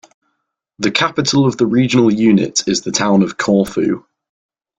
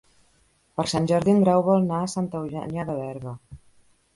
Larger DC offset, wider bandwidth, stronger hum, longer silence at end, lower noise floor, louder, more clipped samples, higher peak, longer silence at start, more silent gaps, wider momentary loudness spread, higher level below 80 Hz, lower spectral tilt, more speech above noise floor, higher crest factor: neither; about the same, 12 kHz vs 11.5 kHz; neither; first, 0.8 s vs 0.6 s; first, -72 dBFS vs -63 dBFS; first, -14 LUFS vs -23 LUFS; neither; first, 0 dBFS vs -8 dBFS; about the same, 0.8 s vs 0.8 s; neither; second, 6 LU vs 17 LU; about the same, -52 dBFS vs -56 dBFS; second, -4.5 dB/octave vs -6.5 dB/octave; first, 58 dB vs 40 dB; about the same, 14 dB vs 18 dB